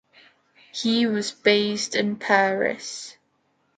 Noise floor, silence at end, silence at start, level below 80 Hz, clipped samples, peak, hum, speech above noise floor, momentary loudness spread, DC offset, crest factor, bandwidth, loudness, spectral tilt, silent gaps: -68 dBFS; 0.65 s; 0.75 s; -72 dBFS; under 0.1%; -2 dBFS; none; 46 dB; 15 LU; under 0.1%; 22 dB; 9.4 kHz; -22 LUFS; -3.5 dB/octave; none